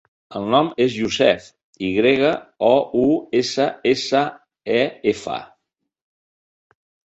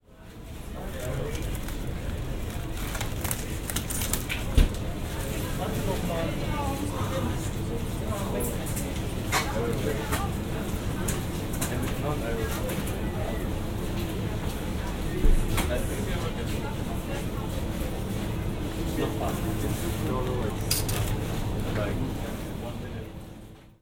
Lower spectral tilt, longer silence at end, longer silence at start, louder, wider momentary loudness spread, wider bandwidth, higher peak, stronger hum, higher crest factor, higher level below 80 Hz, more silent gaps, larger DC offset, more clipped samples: about the same, -5 dB/octave vs -5 dB/octave; first, 1.65 s vs 0.1 s; first, 0.3 s vs 0.1 s; first, -19 LUFS vs -30 LUFS; first, 11 LU vs 7 LU; second, 8.2 kHz vs 17 kHz; first, -2 dBFS vs -8 dBFS; neither; about the same, 18 dB vs 22 dB; second, -56 dBFS vs -32 dBFS; first, 1.63-1.73 s vs none; neither; neither